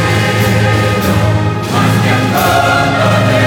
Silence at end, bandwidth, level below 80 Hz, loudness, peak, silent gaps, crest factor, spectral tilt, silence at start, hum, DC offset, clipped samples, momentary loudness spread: 0 s; 18 kHz; -32 dBFS; -11 LUFS; 0 dBFS; none; 10 dB; -5.5 dB/octave; 0 s; none; under 0.1%; under 0.1%; 3 LU